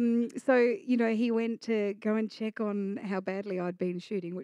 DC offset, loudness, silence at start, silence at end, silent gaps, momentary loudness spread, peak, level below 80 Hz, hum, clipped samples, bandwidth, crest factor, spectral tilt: under 0.1%; -30 LUFS; 0 s; 0 s; none; 9 LU; -14 dBFS; under -90 dBFS; none; under 0.1%; 10 kHz; 16 dB; -7 dB/octave